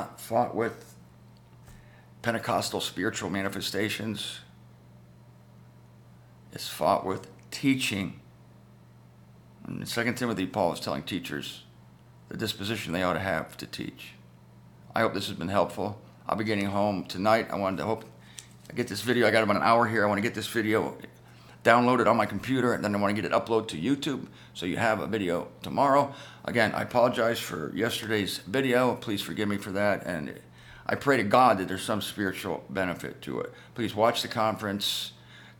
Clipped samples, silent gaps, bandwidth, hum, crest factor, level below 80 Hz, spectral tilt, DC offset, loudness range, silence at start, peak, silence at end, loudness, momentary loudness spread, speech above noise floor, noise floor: under 0.1%; none; 19.5 kHz; none; 24 dB; -62 dBFS; -5 dB/octave; under 0.1%; 7 LU; 0 s; -4 dBFS; 0.05 s; -28 LUFS; 15 LU; 26 dB; -53 dBFS